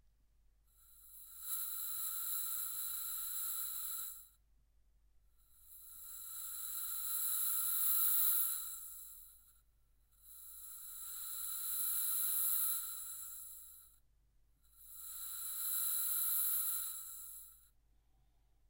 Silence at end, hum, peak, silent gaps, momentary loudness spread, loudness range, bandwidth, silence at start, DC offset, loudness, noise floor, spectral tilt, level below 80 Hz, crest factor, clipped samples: 1.1 s; none; -22 dBFS; none; 20 LU; 9 LU; 16 kHz; 0.9 s; under 0.1%; -36 LUFS; -72 dBFS; 3.5 dB/octave; -72 dBFS; 20 dB; under 0.1%